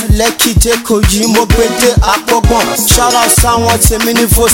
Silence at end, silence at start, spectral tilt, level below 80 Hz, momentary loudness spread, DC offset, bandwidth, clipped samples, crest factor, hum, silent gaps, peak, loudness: 0 s; 0 s; -3.5 dB/octave; -16 dBFS; 3 LU; under 0.1%; over 20 kHz; 0.3%; 8 dB; none; none; 0 dBFS; -9 LUFS